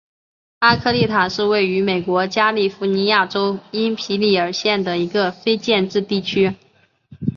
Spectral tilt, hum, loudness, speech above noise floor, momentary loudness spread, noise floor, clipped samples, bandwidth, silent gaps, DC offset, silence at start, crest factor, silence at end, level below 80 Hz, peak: -5.5 dB/octave; none; -18 LUFS; 32 dB; 5 LU; -50 dBFS; under 0.1%; 7.2 kHz; none; under 0.1%; 0.6 s; 16 dB; 0.05 s; -52 dBFS; -2 dBFS